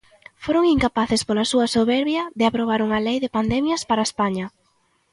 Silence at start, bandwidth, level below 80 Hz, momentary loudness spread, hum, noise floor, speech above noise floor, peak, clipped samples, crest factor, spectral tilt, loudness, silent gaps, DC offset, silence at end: 0.4 s; 11.5 kHz; -46 dBFS; 5 LU; none; -65 dBFS; 45 dB; -6 dBFS; under 0.1%; 16 dB; -4.5 dB/octave; -21 LUFS; none; under 0.1%; 0.65 s